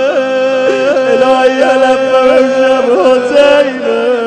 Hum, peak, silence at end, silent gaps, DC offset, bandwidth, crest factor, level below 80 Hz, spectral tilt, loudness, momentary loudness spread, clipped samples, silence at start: none; 0 dBFS; 0 s; none; under 0.1%; 9.4 kHz; 8 dB; -50 dBFS; -4 dB/octave; -9 LUFS; 4 LU; 1%; 0 s